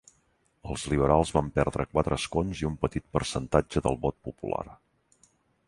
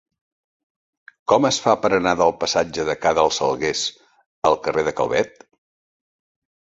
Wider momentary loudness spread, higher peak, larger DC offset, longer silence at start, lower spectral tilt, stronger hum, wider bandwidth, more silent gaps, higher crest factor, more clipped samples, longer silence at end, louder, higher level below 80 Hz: first, 12 LU vs 6 LU; second, -6 dBFS vs -2 dBFS; neither; second, 0.65 s vs 1.3 s; first, -6 dB/octave vs -3.5 dB/octave; neither; first, 11.5 kHz vs 8 kHz; second, none vs 4.26-4.42 s; about the same, 24 dB vs 20 dB; neither; second, 0.9 s vs 1.45 s; second, -28 LUFS vs -20 LUFS; first, -42 dBFS vs -52 dBFS